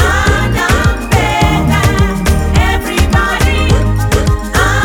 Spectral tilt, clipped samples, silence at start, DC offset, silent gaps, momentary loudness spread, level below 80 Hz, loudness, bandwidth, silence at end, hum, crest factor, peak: -5 dB/octave; under 0.1%; 0 s; under 0.1%; none; 2 LU; -16 dBFS; -12 LUFS; 18.5 kHz; 0 s; none; 10 dB; 0 dBFS